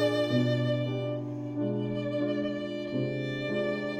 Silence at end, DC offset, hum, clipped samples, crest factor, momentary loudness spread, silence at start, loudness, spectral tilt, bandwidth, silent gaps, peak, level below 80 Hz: 0 s; under 0.1%; none; under 0.1%; 14 dB; 7 LU; 0 s; -31 LUFS; -7.5 dB/octave; 10 kHz; none; -14 dBFS; -64 dBFS